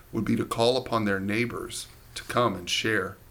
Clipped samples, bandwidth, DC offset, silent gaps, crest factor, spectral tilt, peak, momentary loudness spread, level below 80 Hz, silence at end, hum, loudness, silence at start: under 0.1%; 19 kHz; under 0.1%; none; 18 dB; -4.5 dB/octave; -10 dBFS; 12 LU; -52 dBFS; 0 s; none; -27 LUFS; 0.1 s